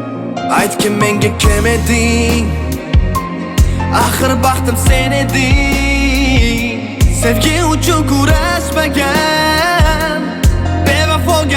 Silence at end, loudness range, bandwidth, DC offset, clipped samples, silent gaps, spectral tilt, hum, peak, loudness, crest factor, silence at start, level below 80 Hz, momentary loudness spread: 0 s; 1 LU; 18.5 kHz; under 0.1%; under 0.1%; none; -4.5 dB/octave; none; 0 dBFS; -12 LUFS; 12 dB; 0 s; -18 dBFS; 4 LU